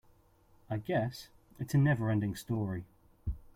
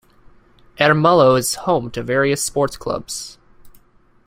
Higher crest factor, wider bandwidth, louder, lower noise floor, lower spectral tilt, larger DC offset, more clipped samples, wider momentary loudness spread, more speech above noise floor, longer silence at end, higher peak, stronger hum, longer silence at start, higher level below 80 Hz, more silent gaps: about the same, 16 dB vs 18 dB; about the same, 15.5 kHz vs 16 kHz; second, -34 LUFS vs -17 LUFS; first, -65 dBFS vs -52 dBFS; first, -7.5 dB/octave vs -4.5 dB/octave; neither; neither; about the same, 16 LU vs 14 LU; about the same, 33 dB vs 35 dB; second, 0.15 s vs 0.6 s; second, -18 dBFS vs -2 dBFS; neither; about the same, 0.7 s vs 0.8 s; about the same, -52 dBFS vs -48 dBFS; neither